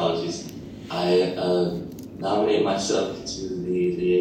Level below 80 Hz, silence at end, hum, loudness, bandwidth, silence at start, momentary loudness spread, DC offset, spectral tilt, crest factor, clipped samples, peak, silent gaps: -54 dBFS; 0 s; none; -24 LUFS; 15.5 kHz; 0 s; 12 LU; under 0.1%; -5 dB/octave; 14 dB; under 0.1%; -10 dBFS; none